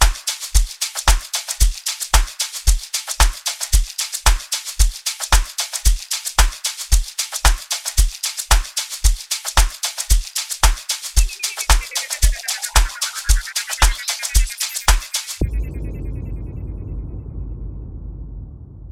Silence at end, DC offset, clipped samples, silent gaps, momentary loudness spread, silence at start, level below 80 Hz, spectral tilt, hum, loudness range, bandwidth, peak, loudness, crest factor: 0 s; 0.2%; under 0.1%; none; 13 LU; 0 s; -20 dBFS; -1.5 dB/octave; none; 4 LU; 16.5 kHz; 0 dBFS; -20 LUFS; 18 dB